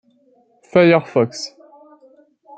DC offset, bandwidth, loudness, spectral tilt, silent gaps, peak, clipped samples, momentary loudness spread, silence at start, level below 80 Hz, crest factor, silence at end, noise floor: under 0.1%; 8.8 kHz; -16 LUFS; -6 dB/octave; none; -2 dBFS; under 0.1%; 17 LU; 0.75 s; -62 dBFS; 18 dB; 1.1 s; -57 dBFS